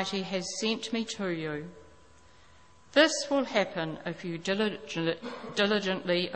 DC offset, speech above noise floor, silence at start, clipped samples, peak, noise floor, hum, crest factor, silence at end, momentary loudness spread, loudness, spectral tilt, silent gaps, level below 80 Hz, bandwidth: 0.1%; 29 dB; 0 s; under 0.1%; -8 dBFS; -59 dBFS; none; 24 dB; 0 s; 12 LU; -30 LUFS; -4 dB/octave; none; -68 dBFS; 8.8 kHz